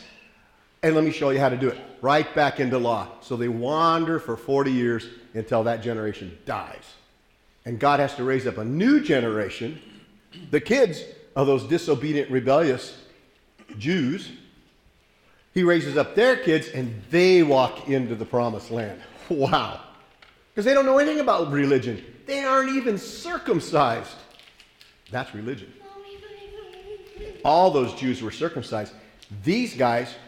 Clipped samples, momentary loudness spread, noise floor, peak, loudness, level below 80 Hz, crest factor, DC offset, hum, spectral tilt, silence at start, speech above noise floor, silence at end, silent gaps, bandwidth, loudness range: under 0.1%; 18 LU; -60 dBFS; -6 dBFS; -23 LUFS; -58 dBFS; 18 dB; under 0.1%; none; -6 dB/octave; 0 s; 37 dB; 0 s; none; 15 kHz; 6 LU